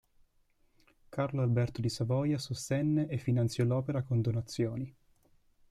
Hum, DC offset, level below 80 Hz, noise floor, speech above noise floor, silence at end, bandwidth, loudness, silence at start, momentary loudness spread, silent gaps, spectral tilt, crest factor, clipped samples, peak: none; under 0.1%; -62 dBFS; -70 dBFS; 39 dB; 0.8 s; 13 kHz; -32 LUFS; 1.1 s; 5 LU; none; -7 dB/octave; 14 dB; under 0.1%; -18 dBFS